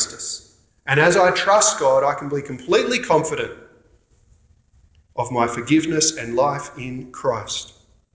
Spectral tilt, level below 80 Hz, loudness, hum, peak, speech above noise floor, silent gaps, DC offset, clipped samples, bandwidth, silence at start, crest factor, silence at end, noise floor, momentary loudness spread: -3.5 dB/octave; -54 dBFS; -19 LUFS; none; -2 dBFS; 37 dB; none; under 0.1%; under 0.1%; 8 kHz; 0 s; 18 dB; 0.5 s; -56 dBFS; 16 LU